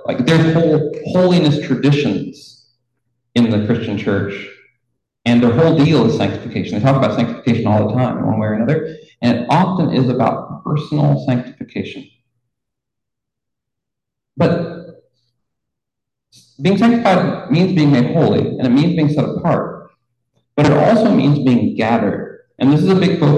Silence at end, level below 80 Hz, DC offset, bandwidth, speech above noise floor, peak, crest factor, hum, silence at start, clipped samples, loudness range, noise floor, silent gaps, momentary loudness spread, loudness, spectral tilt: 0 s; -48 dBFS; under 0.1%; 9.6 kHz; 68 dB; 0 dBFS; 14 dB; none; 0 s; under 0.1%; 10 LU; -82 dBFS; none; 12 LU; -15 LUFS; -8 dB/octave